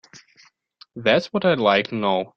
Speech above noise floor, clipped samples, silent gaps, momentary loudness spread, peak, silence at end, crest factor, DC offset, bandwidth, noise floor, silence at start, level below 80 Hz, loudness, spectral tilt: 37 dB; under 0.1%; none; 6 LU; -2 dBFS; 0.1 s; 20 dB; under 0.1%; 7.4 kHz; -57 dBFS; 0.15 s; -62 dBFS; -20 LUFS; -6 dB/octave